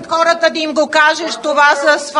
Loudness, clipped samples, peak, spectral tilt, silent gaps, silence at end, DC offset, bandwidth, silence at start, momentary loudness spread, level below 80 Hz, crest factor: -12 LUFS; under 0.1%; 0 dBFS; -1 dB/octave; none; 0 s; under 0.1%; 11 kHz; 0 s; 6 LU; -62 dBFS; 14 dB